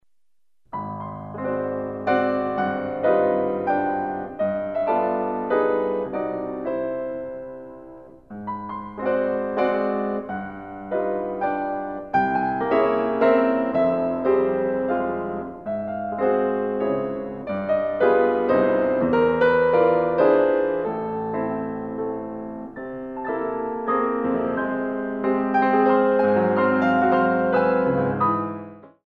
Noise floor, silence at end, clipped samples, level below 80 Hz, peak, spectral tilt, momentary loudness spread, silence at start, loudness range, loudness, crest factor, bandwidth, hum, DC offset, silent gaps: -86 dBFS; 0.2 s; under 0.1%; -58 dBFS; -6 dBFS; -9 dB/octave; 14 LU; 0.75 s; 7 LU; -22 LUFS; 16 dB; 5.2 kHz; none; 0.1%; none